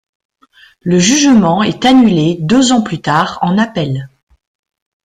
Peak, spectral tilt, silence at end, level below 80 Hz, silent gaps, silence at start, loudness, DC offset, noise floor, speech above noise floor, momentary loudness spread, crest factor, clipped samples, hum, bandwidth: 0 dBFS; -4.5 dB/octave; 1 s; -46 dBFS; none; 0.85 s; -11 LUFS; under 0.1%; -46 dBFS; 36 dB; 9 LU; 12 dB; under 0.1%; none; 11 kHz